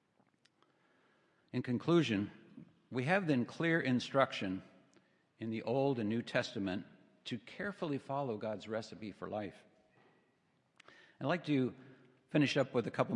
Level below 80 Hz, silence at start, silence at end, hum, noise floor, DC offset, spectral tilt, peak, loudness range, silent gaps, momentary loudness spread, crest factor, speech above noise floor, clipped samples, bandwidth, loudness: -80 dBFS; 1.55 s; 0 s; none; -76 dBFS; under 0.1%; -6.5 dB/octave; -14 dBFS; 8 LU; none; 13 LU; 24 dB; 40 dB; under 0.1%; 10.5 kHz; -36 LUFS